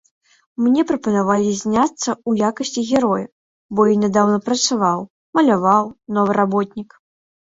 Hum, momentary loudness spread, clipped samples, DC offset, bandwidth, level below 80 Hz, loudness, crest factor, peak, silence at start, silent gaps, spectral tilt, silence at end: none; 8 LU; under 0.1%; under 0.1%; 8 kHz; -58 dBFS; -18 LUFS; 16 dB; -2 dBFS; 0.6 s; 3.32-3.69 s, 5.10-5.33 s; -5 dB/octave; 0.65 s